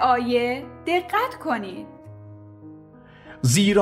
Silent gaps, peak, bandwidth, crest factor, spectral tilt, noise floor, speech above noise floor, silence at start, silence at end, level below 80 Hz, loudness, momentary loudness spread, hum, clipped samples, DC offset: none; -6 dBFS; 16 kHz; 18 dB; -4.5 dB/octave; -47 dBFS; 26 dB; 0 s; 0 s; -54 dBFS; -23 LUFS; 25 LU; none; under 0.1%; under 0.1%